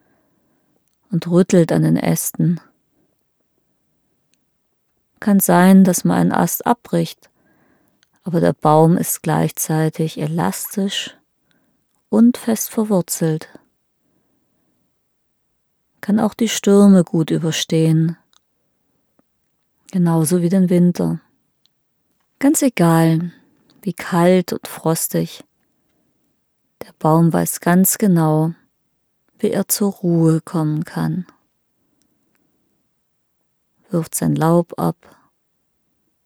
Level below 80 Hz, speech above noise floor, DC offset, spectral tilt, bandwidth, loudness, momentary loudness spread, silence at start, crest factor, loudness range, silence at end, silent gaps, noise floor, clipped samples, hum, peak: -62 dBFS; 52 dB; under 0.1%; -6 dB/octave; 18 kHz; -17 LUFS; 11 LU; 1.1 s; 18 dB; 7 LU; 1.35 s; none; -68 dBFS; under 0.1%; none; 0 dBFS